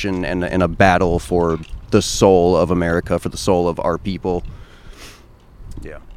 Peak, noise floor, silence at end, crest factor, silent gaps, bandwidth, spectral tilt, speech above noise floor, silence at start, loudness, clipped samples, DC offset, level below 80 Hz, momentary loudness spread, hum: 0 dBFS; -44 dBFS; 0 s; 18 dB; none; 15.5 kHz; -5.5 dB/octave; 27 dB; 0 s; -17 LUFS; under 0.1%; under 0.1%; -34 dBFS; 12 LU; none